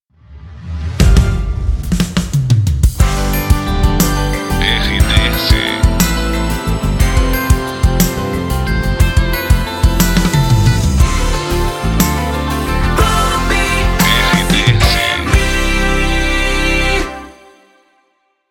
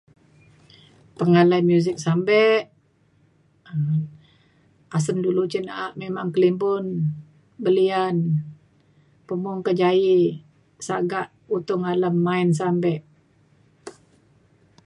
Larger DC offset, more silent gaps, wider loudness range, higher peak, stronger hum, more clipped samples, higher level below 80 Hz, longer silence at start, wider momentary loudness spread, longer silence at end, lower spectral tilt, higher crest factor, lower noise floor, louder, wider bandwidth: neither; neither; about the same, 3 LU vs 4 LU; first, 0 dBFS vs -6 dBFS; neither; neither; first, -16 dBFS vs -68 dBFS; second, 0.3 s vs 1.2 s; second, 6 LU vs 14 LU; first, 1.2 s vs 0.95 s; second, -4.5 dB/octave vs -7 dB/octave; second, 12 dB vs 18 dB; about the same, -61 dBFS vs -61 dBFS; first, -14 LUFS vs -22 LUFS; first, 17.5 kHz vs 11 kHz